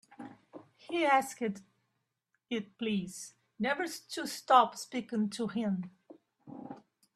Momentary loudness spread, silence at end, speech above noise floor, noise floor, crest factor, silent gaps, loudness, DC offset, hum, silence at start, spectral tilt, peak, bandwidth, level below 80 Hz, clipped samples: 24 LU; 0.35 s; 50 dB; -82 dBFS; 24 dB; none; -32 LUFS; under 0.1%; none; 0.1 s; -4.5 dB/octave; -10 dBFS; 14.5 kHz; -78 dBFS; under 0.1%